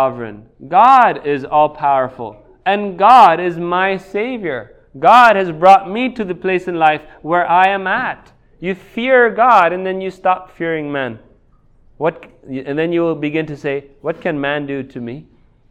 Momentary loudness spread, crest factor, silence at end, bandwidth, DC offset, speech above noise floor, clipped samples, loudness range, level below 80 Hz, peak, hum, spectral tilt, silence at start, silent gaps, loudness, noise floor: 16 LU; 14 dB; 0.5 s; 10.5 kHz; under 0.1%; 36 dB; 0.4%; 9 LU; -52 dBFS; 0 dBFS; none; -6 dB/octave; 0 s; none; -14 LUFS; -50 dBFS